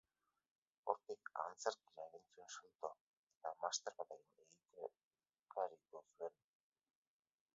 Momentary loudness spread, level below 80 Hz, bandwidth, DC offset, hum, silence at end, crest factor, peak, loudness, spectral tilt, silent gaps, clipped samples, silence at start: 16 LU; under -90 dBFS; 7.6 kHz; under 0.1%; none; 1.25 s; 30 dB; -22 dBFS; -49 LUFS; 1 dB/octave; 2.75-2.79 s, 3.01-3.27 s, 3.37-3.41 s, 5.05-5.11 s; under 0.1%; 0.85 s